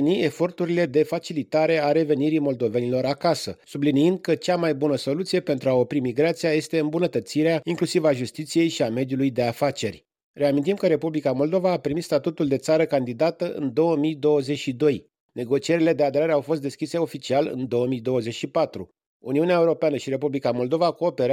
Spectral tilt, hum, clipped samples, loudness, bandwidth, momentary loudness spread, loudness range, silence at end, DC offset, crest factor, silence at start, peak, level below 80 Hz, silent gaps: -6 dB/octave; none; under 0.1%; -23 LUFS; 16.5 kHz; 6 LU; 2 LU; 0 s; under 0.1%; 14 dB; 0 s; -8 dBFS; -64 dBFS; 10.24-10.34 s, 15.20-15.29 s, 19.06-19.20 s